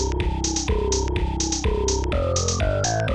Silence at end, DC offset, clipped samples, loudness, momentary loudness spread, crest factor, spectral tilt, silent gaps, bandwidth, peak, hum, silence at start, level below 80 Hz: 0 s; 0.5%; under 0.1%; -23 LUFS; 2 LU; 14 dB; -4 dB/octave; none; 9.8 kHz; -8 dBFS; none; 0 s; -26 dBFS